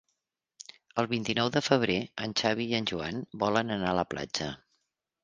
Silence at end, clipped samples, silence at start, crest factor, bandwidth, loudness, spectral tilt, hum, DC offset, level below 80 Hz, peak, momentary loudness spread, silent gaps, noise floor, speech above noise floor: 0.65 s; under 0.1%; 0.95 s; 24 dB; 9.8 kHz; -30 LUFS; -4.5 dB/octave; none; under 0.1%; -60 dBFS; -6 dBFS; 12 LU; none; -83 dBFS; 53 dB